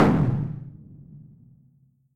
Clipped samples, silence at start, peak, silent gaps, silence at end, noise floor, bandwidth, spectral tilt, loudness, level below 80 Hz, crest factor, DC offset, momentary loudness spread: under 0.1%; 0 s; -6 dBFS; none; 0.95 s; -61 dBFS; 9.2 kHz; -9 dB/octave; -25 LUFS; -46 dBFS; 20 dB; under 0.1%; 26 LU